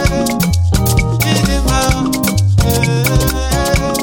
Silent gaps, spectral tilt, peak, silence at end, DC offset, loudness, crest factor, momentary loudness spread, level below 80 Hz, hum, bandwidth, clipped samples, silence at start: none; -5 dB/octave; -2 dBFS; 0 s; under 0.1%; -14 LUFS; 12 dB; 2 LU; -20 dBFS; none; 17 kHz; under 0.1%; 0 s